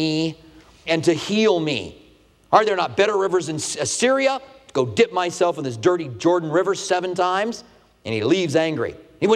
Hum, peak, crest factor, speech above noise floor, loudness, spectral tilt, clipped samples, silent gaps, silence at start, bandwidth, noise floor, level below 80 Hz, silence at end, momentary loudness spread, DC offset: none; 0 dBFS; 20 dB; 33 dB; -21 LUFS; -4.5 dB/octave; under 0.1%; none; 0 s; 13 kHz; -53 dBFS; -60 dBFS; 0 s; 10 LU; under 0.1%